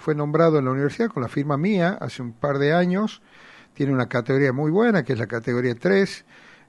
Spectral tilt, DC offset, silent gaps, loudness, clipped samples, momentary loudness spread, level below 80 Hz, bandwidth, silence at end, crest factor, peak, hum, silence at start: -7.5 dB/octave; under 0.1%; none; -22 LUFS; under 0.1%; 8 LU; -62 dBFS; 11.5 kHz; 0.5 s; 18 dB; -4 dBFS; none; 0 s